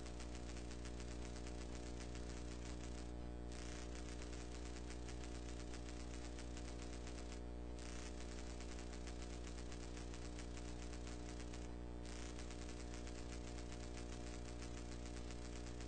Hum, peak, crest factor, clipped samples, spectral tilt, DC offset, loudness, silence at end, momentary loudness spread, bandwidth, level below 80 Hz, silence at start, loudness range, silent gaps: 60 Hz at -50 dBFS; -34 dBFS; 14 dB; under 0.1%; -5 dB/octave; 0.2%; -52 LUFS; 0 s; 1 LU; 9 kHz; -52 dBFS; 0 s; 0 LU; none